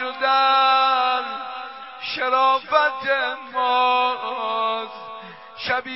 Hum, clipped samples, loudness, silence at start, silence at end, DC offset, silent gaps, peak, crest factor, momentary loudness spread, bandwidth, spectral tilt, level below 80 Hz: none; under 0.1%; -20 LUFS; 0 s; 0 s; 0.1%; none; -4 dBFS; 18 dB; 17 LU; 5.8 kHz; -5.5 dB/octave; -68 dBFS